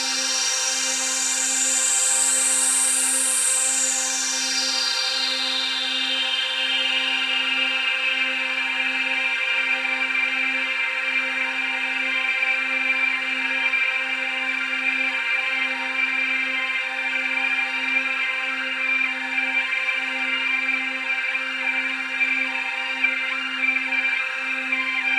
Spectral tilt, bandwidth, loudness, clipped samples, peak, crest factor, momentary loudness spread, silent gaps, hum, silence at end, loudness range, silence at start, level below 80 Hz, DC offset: 3.5 dB/octave; 16 kHz; -20 LUFS; under 0.1%; -8 dBFS; 16 dB; 5 LU; none; none; 0 s; 4 LU; 0 s; -78 dBFS; under 0.1%